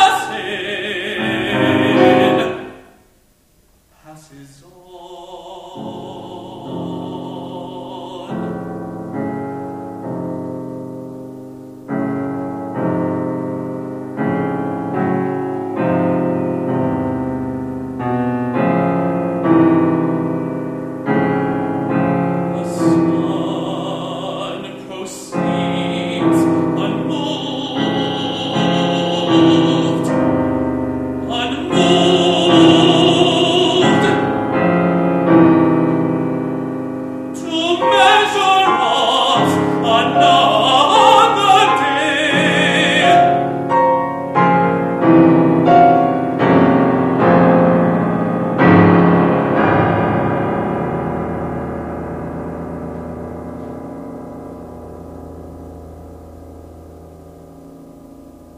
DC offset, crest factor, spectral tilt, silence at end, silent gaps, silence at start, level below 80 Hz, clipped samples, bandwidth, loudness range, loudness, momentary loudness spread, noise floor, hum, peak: under 0.1%; 16 dB; -6 dB/octave; 0 s; none; 0 s; -46 dBFS; under 0.1%; 13 kHz; 17 LU; -15 LUFS; 18 LU; -54 dBFS; none; 0 dBFS